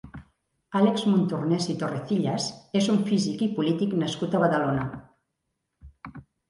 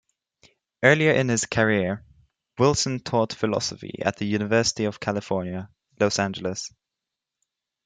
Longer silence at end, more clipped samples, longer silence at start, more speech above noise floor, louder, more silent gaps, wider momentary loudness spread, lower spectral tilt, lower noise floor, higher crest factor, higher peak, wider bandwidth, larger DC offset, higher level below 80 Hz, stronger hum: second, 0.3 s vs 1.2 s; neither; second, 0.05 s vs 0.8 s; second, 55 dB vs 63 dB; about the same, -25 LUFS vs -23 LUFS; neither; first, 21 LU vs 12 LU; first, -6 dB/octave vs -4.5 dB/octave; second, -80 dBFS vs -86 dBFS; second, 18 dB vs 24 dB; second, -8 dBFS vs -2 dBFS; first, 11.5 kHz vs 9.6 kHz; neither; about the same, -58 dBFS vs -58 dBFS; neither